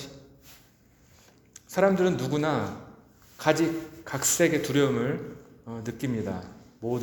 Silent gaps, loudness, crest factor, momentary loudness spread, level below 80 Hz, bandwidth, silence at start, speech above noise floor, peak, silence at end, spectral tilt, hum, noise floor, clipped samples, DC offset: none; -27 LUFS; 22 dB; 19 LU; -62 dBFS; over 20 kHz; 0 s; 33 dB; -6 dBFS; 0 s; -4.5 dB/octave; none; -59 dBFS; under 0.1%; under 0.1%